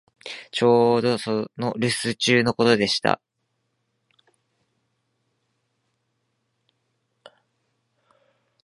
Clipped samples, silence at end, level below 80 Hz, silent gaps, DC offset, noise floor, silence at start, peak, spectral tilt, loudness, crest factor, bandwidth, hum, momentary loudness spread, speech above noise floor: under 0.1%; 5.5 s; -64 dBFS; none; under 0.1%; -75 dBFS; 0.25 s; 0 dBFS; -4.5 dB/octave; -21 LUFS; 24 dB; 11.5 kHz; none; 11 LU; 54 dB